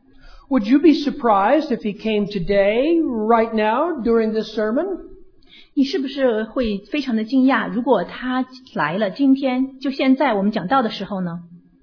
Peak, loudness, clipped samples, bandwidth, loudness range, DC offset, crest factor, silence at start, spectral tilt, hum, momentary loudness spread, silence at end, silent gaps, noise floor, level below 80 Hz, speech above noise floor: -4 dBFS; -19 LUFS; under 0.1%; 5.4 kHz; 3 LU; under 0.1%; 16 dB; 0.25 s; -7 dB/octave; none; 8 LU; 0.25 s; none; -47 dBFS; -46 dBFS; 29 dB